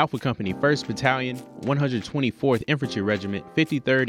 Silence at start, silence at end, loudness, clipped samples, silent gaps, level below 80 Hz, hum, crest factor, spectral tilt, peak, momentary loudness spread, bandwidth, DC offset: 0 s; 0 s; -25 LUFS; under 0.1%; none; -58 dBFS; none; 20 dB; -6 dB/octave; -4 dBFS; 5 LU; 14.5 kHz; under 0.1%